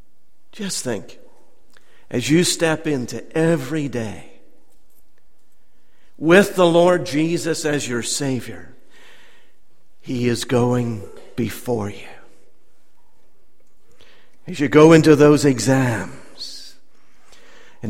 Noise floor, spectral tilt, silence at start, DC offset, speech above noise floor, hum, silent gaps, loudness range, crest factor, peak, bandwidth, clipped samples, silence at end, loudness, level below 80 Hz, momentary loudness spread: -62 dBFS; -5 dB/octave; 0.55 s; 2%; 45 dB; none; none; 10 LU; 20 dB; 0 dBFS; 16.5 kHz; under 0.1%; 0 s; -18 LUFS; -52 dBFS; 21 LU